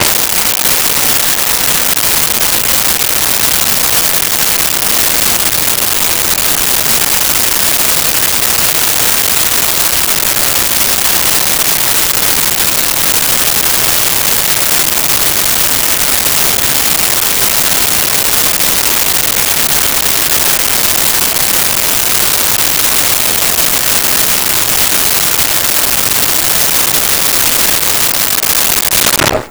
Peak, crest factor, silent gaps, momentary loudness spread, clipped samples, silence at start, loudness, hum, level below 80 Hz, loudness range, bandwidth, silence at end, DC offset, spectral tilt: 0 dBFS; 10 dB; none; 1 LU; under 0.1%; 0 s; -8 LUFS; none; -34 dBFS; 0 LU; over 20 kHz; 0 s; under 0.1%; -0.5 dB/octave